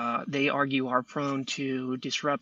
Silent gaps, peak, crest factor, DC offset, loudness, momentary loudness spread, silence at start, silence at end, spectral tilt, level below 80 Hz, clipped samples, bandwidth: none; -12 dBFS; 18 dB; under 0.1%; -29 LUFS; 5 LU; 0 s; 0.05 s; -4.5 dB/octave; -76 dBFS; under 0.1%; 8 kHz